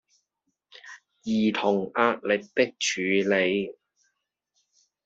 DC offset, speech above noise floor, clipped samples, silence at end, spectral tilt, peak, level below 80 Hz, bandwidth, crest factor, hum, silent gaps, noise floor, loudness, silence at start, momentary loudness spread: under 0.1%; 55 dB; under 0.1%; 1.35 s; -4 dB/octave; -8 dBFS; -70 dBFS; 8 kHz; 20 dB; none; none; -79 dBFS; -25 LUFS; 0.85 s; 16 LU